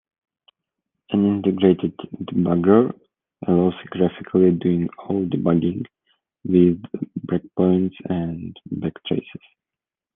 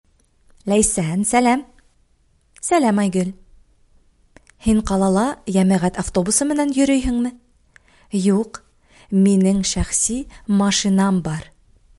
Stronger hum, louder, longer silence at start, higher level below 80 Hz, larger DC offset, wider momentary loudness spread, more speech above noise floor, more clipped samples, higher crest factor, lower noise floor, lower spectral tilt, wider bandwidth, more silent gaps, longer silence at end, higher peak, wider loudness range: neither; second, -21 LUFS vs -18 LUFS; first, 1.1 s vs 0.65 s; second, -60 dBFS vs -38 dBFS; neither; first, 14 LU vs 10 LU; first, 69 dB vs 42 dB; neither; about the same, 20 dB vs 18 dB; first, -89 dBFS vs -59 dBFS; first, -11.5 dB/octave vs -5 dB/octave; second, 3.8 kHz vs 11.5 kHz; neither; first, 0.85 s vs 0.6 s; about the same, -2 dBFS vs -2 dBFS; about the same, 3 LU vs 3 LU